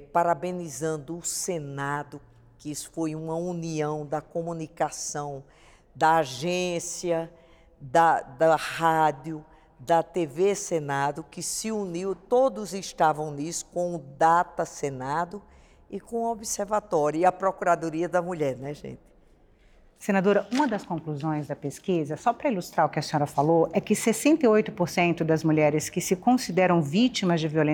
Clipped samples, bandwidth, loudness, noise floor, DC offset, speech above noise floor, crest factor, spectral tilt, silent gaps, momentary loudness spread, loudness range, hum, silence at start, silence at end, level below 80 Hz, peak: under 0.1%; 20 kHz; -26 LUFS; -57 dBFS; under 0.1%; 32 dB; 18 dB; -5 dB/octave; none; 12 LU; 8 LU; none; 0 s; 0 s; -60 dBFS; -8 dBFS